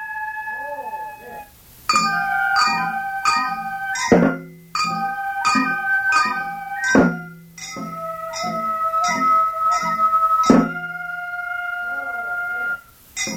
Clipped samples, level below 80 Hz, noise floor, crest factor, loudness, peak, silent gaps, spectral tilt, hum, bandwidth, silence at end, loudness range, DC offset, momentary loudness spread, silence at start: under 0.1%; -52 dBFS; -43 dBFS; 20 dB; -20 LUFS; -2 dBFS; none; -4 dB/octave; none; 18 kHz; 0 s; 3 LU; under 0.1%; 14 LU; 0 s